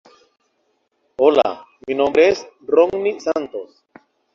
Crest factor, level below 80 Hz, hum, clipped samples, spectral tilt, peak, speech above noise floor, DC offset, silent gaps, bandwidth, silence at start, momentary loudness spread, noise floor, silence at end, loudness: 18 dB; -60 dBFS; none; under 0.1%; -4.5 dB/octave; -2 dBFS; 50 dB; under 0.1%; none; 7.2 kHz; 1.2 s; 17 LU; -67 dBFS; 0.7 s; -18 LUFS